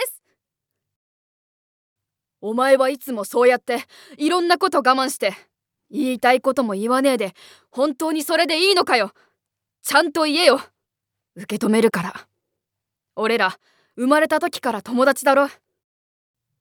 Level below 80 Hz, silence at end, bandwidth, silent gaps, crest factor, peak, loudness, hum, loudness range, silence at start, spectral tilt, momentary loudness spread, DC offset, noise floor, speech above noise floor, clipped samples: -74 dBFS; 1.1 s; 20 kHz; 0.96-1.96 s; 20 dB; 0 dBFS; -19 LUFS; none; 3 LU; 0 s; -3.5 dB/octave; 11 LU; under 0.1%; -83 dBFS; 64 dB; under 0.1%